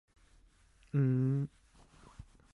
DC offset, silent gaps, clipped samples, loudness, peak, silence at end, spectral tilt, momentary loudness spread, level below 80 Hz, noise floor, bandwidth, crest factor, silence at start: under 0.1%; none; under 0.1%; -33 LUFS; -22 dBFS; 0.3 s; -10 dB/octave; 26 LU; -62 dBFS; -65 dBFS; 4.2 kHz; 16 dB; 0.95 s